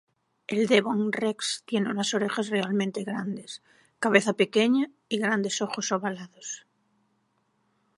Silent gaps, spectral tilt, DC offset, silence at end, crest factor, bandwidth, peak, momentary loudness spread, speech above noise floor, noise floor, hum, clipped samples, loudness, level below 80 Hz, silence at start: none; -4 dB/octave; under 0.1%; 1.4 s; 24 dB; 11.5 kHz; -2 dBFS; 15 LU; 45 dB; -72 dBFS; none; under 0.1%; -26 LUFS; -78 dBFS; 0.5 s